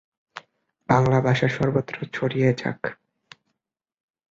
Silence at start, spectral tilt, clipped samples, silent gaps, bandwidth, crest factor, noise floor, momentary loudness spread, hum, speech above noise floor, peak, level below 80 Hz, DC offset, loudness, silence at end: 0.35 s; -7.5 dB/octave; under 0.1%; none; 7.6 kHz; 22 dB; -83 dBFS; 24 LU; none; 61 dB; -4 dBFS; -54 dBFS; under 0.1%; -23 LUFS; 1.35 s